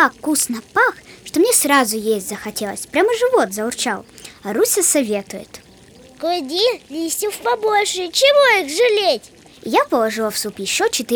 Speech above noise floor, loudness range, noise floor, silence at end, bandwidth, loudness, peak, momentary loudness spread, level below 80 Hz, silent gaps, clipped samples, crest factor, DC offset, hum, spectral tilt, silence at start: 27 dB; 4 LU; -45 dBFS; 0 s; over 20 kHz; -17 LUFS; 0 dBFS; 12 LU; -58 dBFS; none; under 0.1%; 18 dB; under 0.1%; none; -1.5 dB/octave; 0 s